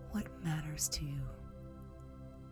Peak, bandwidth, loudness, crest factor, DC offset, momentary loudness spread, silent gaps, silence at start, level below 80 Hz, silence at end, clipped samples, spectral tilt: -22 dBFS; over 20 kHz; -39 LUFS; 20 dB; under 0.1%; 16 LU; none; 0 s; -52 dBFS; 0 s; under 0.1%; -4 dB/octave